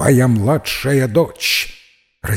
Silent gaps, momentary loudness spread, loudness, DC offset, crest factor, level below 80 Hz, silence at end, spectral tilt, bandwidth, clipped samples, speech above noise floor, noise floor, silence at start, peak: none; 8 LU; -15 LUFS; under 0.1%; 14 dB; -42 dBFS; 0 s; -5 dB/octave; 16.5 kHz; under 0.1%; 34 dB; -49 dBFS; 0 s; -2 dBFS